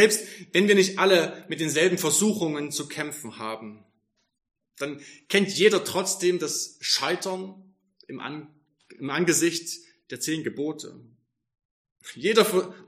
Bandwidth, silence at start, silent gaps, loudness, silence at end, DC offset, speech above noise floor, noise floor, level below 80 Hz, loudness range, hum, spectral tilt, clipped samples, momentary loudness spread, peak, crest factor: 15.5 kHz; 0 s; 11.65-11.85 s, 11.92-11.96 s; -24 LUFS; 0.05 s; under 0.1%; 48 dB; -72 dBFS; -76 dBFS; 6 LU; none; -3 dB/octave; under 0.1%; 18 LU; -4 dBFS; 22 dB